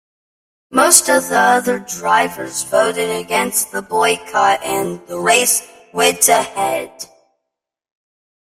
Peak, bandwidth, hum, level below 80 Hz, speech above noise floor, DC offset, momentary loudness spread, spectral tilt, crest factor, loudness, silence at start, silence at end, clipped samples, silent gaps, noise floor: 0 dBFS; 16 kHz; none; -58 dBFS; 66 dB; under 0.1%; 12 LU; -1.5 dB/octave; 18 dB; -15 LUFS; 0.7 s; 1.5 s; under 0.1%; none; -81 dBFS